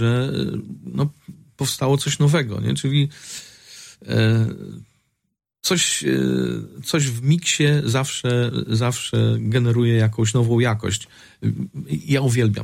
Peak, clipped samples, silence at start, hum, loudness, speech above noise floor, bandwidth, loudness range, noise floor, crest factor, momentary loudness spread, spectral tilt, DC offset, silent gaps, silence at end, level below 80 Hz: -6 dBFS; under 0.1%; 0 s; none; -20 LUFS; 24 dB; 16 kHz; 3 LU; -44 dBFS; 14 dB; 12 LU; -5 dB/octave; under 0.1%; none; 0 s; -54 dBFS